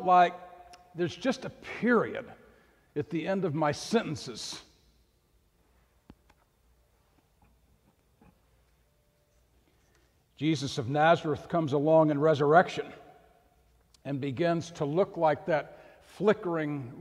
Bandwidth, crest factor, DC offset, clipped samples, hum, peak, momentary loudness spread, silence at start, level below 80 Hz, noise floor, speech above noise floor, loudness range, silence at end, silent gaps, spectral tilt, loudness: 13 kHz; 24 dB; under 0.1%; under 0.1%; none; -8 dBFS; 17 LU; 0 s; -66 dBFS; -69 dBFS; 41 dB; 12 LU; 0 s; none; -6 dB/octave; -28 LUFS